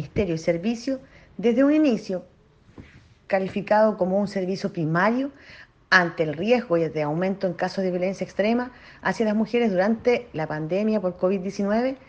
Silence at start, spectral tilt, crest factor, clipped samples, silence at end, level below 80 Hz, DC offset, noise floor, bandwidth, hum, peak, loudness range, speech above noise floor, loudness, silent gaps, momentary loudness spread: 0 s; -6.5 dB/octave; 22 dB; under 0.1%; 0.1 s; -56 dBFS; under 0.1%; -49 dBFS; 8.6 kHz; none; -2 dBFS; 2 LU; 26 dB; -24 LUFS; none; 9 LU